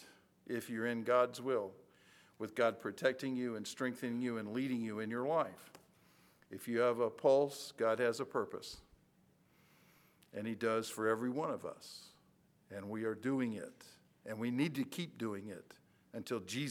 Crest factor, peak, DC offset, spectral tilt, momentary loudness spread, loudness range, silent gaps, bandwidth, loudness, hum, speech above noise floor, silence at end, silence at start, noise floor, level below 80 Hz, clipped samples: 20 dB; -18 dBFS; under 0.1%; -5.5 dB/octave; 18 LU; 5 LU; none; 19 kHz; -38 LUFS; none; 33 dB; 0 s; 0 s; -71 dBFS; -80 dBFS; under 0.1%